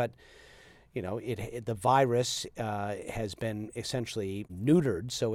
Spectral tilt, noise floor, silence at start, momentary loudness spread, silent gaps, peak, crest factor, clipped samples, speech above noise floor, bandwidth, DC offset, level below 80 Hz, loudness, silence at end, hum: -5.5 dB/octave; -56 dBFS; 0 s; 11 LU; none; -12 dBFS; 20 dB; under 0.1%; 25 dB; 16.5 kHz; under 0.1%; -58 dBFS; -31 LUFS; 0 s; none